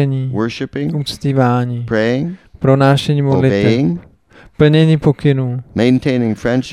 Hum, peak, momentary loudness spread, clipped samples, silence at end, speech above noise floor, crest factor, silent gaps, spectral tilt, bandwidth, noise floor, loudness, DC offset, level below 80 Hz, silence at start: none; 0 dBFS; 9 LU; under 0.1%; 0 s; 31 dB; 14 dB; none; -7.5 dB/octave; 11 kHz; -44 dBFS; -15 LUFS; under 0.1%; -42 dBFS; 0 s